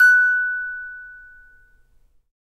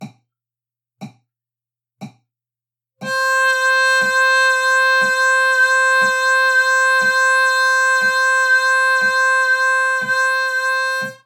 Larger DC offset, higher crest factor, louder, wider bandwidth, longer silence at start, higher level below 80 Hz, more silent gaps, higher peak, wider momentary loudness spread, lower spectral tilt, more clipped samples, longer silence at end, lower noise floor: neither; about the same, 16 dB vs 12 dB; second, -18 LUFS vs -14 LUFS; second, 14 kHz vs 18 kHz; about the same, 0 s vs 0 s; first, -58 dBFS vs -88 dBFS; neither; about the same, -6 dBFS vs -6 dBFS; first, 24 LU vs 4 LU; second, 2 dB/octave vs -0.5 dB/octave; neither; first, 1.35 s vs 0.1 s; second, -57 dBFS vs -90 dBFS